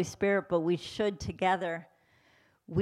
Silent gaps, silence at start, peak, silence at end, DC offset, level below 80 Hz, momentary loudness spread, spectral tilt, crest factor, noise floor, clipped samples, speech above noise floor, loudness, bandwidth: none; 0 s; -16 dBFS; 0 s; under 0.1%; -58 dBFS; 7 LU; -5.5 dB/octave; 16 dB; -66 dBFS; under 0.1%; 36 dB; -31 LUFS; 14 kHz